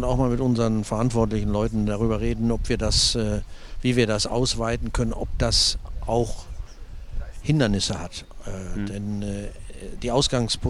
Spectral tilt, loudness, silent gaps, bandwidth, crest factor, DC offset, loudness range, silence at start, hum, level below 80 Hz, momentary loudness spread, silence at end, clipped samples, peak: -4.5 dB/octave; -24 LUFS; none; 13 kHz; 18 dB; under 0.1%; 5 LU; 0 s; none; -32 dBFS; 19 LU; 0 s; under 0.1%; -6 dBFS